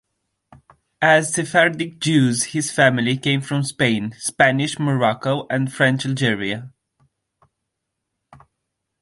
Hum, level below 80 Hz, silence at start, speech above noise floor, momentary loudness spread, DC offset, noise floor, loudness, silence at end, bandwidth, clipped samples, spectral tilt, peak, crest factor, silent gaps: none; -60 dBFS; 1 s; 60 dB; 7 LU; under 0.1%; -79 dBFS; -19 LUFS; 2.3 s; 11.5 kHz; under 0.1%; -4.5 dB/octave; -2 dBFS; 20 dB; none